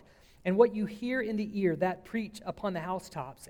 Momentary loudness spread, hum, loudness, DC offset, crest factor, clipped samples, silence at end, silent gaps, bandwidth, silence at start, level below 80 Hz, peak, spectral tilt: 11 LU; none; -31 LUFS; under 0.1%; 22 dB; under 0.1%; 0.05 s; none; 16 kHz; 0.45 s; -62 dBFS; -8 dBFS; -7 dB/octave